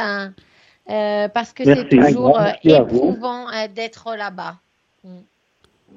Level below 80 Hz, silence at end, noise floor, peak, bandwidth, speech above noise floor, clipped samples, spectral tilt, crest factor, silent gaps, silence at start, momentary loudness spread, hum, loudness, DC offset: -52 dBFS; 0.8 s; -61 dBFS; 0 dBFS; 7.6 kHz; 44 dB; under 0.1%; -7 dB/octave; 18 dB; none; 0 s; 15 LU; none; -17 LUFS; under 0.1%